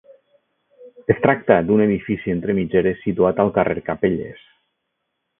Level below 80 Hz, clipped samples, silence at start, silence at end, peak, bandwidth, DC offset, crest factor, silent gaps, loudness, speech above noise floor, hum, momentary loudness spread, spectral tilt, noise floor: -48 dBFS; under 0.1%; 0.8 s; 1.05 s; 0 dBFS; 3.8 kHz; under 0.1%; 20 dB; none; -19 LUFS; 57 dB; none; 7 LU; -12.5 dB/octave; -75 dBFS